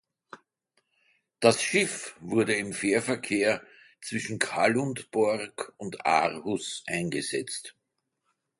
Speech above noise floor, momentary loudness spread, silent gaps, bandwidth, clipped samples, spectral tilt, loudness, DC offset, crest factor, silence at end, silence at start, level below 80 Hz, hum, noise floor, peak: 53 dB; 12 LU; none; 11.5 kHz; under 0.1%; -3.5 dB/octave; -28 LUFS; under 0.1%; 22 dB; 0.9 s; 0.35 s; -68 dBFS; none; -80 dBFS; -6 dBFS